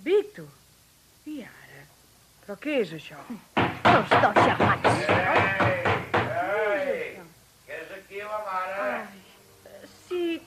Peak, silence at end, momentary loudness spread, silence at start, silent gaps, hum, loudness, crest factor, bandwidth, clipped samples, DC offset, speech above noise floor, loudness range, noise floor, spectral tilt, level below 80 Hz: -6 dBFS; 0.05 s; 20 LU; 0 s; none; none; -24 LUFS; 20 dB; 15 kHz; under 0.1%; under 0.1%; 35 dB; 12 LU; -58 dBFS; -5.5 dB/octave; -60 dBFS